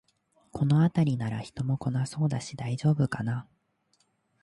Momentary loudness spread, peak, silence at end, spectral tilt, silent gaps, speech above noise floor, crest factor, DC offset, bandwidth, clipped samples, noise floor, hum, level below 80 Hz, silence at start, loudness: 10 LU; -14 dBFS; 1 s; -7.5 dB/octave; none; 44 dB; 14 dB; under 0.1%; 11.5 kHz; under 0.1%; -71 dBFS; none; -60 dBFS; 0.55 s; -28 LUFS